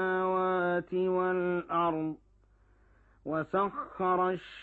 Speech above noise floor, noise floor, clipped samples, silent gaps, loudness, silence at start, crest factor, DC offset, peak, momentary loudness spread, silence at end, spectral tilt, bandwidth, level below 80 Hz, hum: 33 dB; -64 dBFS; under 0.1%; none; -31 LUFS; 0 s; 14 dB; under 0.1%; -16 dBFS; 7 LU; 0 s; -9 dB/octave; 4.4 kHz; -64 dBFS; none